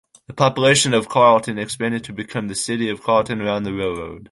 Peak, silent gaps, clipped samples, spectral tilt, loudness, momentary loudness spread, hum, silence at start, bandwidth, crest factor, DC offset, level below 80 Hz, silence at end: -2 dBFS; none; under 0.1%; -4 dB/octave; -19 LUFS; 13 LU; none; 0.3 s; 11.5 kHz; 18 dB; under 0.1%; -52 dBFS; 0.05 s